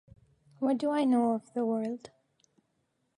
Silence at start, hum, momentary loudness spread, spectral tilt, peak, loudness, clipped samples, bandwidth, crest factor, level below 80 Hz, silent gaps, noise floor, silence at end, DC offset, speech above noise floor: 0.6 s; none; 9 LU; -6.5 dB/octave; -16 dBFS; -30 LUFS; under 0.1%; 11 kHz; 16 dB; -74 dBFS; none; -77 dBFS; 1.1 s; under 0.1%; 48 dB